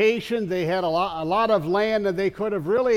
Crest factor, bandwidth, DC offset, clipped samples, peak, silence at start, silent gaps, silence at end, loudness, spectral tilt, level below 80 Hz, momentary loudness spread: 14 dB; 15.5 kHz; under 0.1%; under 0.1%; -8 dBFS; 0 s; none; 0 s; -23 LUFS; -6 dB/octave; -54 dBFS; 5 LU